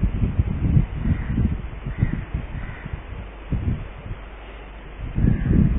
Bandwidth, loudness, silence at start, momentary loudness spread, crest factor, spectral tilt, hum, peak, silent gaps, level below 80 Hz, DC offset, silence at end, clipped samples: 3.8 kHz; -25 LUFS; 0 s; 16 LU; 18 dB; -13 dB/octave; none; -6 dBFS; none; -28 dBFS; under 0.1%; 0 s; under 0.1%